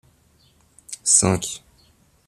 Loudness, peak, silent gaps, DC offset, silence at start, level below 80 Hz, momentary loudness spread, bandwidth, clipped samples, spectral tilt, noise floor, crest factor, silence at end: -18 LUFS; -2 dBFS; none; under 0.1%; 0.9 s; -54 dBFS; 21 LU; 14 kHz; under 0.1%; -3 dB/octave; -58 dBFS; 24 dB; 0.7 s